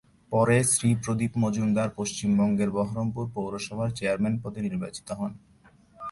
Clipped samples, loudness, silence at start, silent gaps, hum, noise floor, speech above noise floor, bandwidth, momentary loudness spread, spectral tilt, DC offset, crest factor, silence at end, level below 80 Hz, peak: under 0.1%; -27 LUFS; 0.3 s; none; none; -57 dBFS; 31 dB; 11.5 kHz; 12 LU; -5.5 dB/octave; under 0.1%; 16 dB; 0 s; -56 dBFS; -10 dBFS